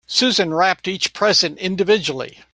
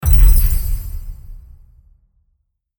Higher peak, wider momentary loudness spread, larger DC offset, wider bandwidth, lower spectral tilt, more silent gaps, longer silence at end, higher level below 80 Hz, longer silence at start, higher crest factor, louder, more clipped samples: about the same, -2 dBFS vs 0 dBFS; second, 7 LU vs 24 LU; neither; second, 10.5 kHz vs over 20 kHz; second, -3 dB/octave vs -5 dB/octave; neither; second, 0.25 s vs 1.4 s; second, -60 dBFS vs -16 dBFS; about the same, 0.1 s vs 0 s; about the same, 16 dB vs 14 dB; about the same, -17 LUFS vs -16 LUFS; neither